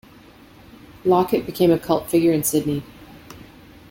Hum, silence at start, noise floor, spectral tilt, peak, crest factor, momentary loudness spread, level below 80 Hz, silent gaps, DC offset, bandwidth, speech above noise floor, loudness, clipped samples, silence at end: none; 1.05 s; -47 dBFS; -5.5 dB/octave; -6 dBFS; 16 dB; 20 LU; -52 dBFS; none; under 0.1%; 17 kHz; 28 dB; -20 LUFS; under 0.1%; 0.45 s